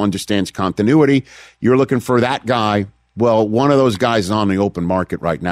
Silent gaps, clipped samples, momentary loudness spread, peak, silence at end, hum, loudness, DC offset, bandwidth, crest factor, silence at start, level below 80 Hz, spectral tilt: none; under 0.1%; 7 LU; -2 dBFS; 0 s; none; -16 LUFS; under 0.1%; 15.5 kHz; 12 dB; 0 s; -48 dBFS; -6.5 dB/octave